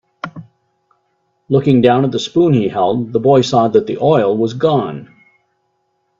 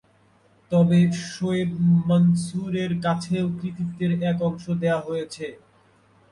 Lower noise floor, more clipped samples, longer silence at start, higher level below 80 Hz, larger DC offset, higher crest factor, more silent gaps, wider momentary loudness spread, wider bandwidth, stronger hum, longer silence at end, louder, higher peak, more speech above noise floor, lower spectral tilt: first, -65 dBFS vs -59 dBFS; neither; second, 0.25 s vs 0.7 s; about the same, -54 dBFS vs -58 dBFS; neither; about the same, 16 dB vs 14 dB; neither; first, 14 LU vs 11 LU; second, 7.8 kHz vs 11 kHz; neither; first, 1.15 s vs 0.75 s; first, -14 LUFS vs -23 LUFS; first, 0 dBFS vs -10 dBFS; first, 53 dB vs 37 dB; about the same, -7 dB/octave vs -7.5 dB/octave